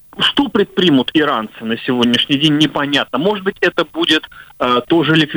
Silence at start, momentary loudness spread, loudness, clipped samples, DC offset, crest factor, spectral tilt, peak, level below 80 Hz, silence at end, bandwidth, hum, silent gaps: 0.15 s; 5 LU; -15 LUFS; under 0.1%; under 0.1%; 14 dB; -5 dB/octave; -2 dBFS; -50 dBFS; 0 s; over 20 kHz; none; none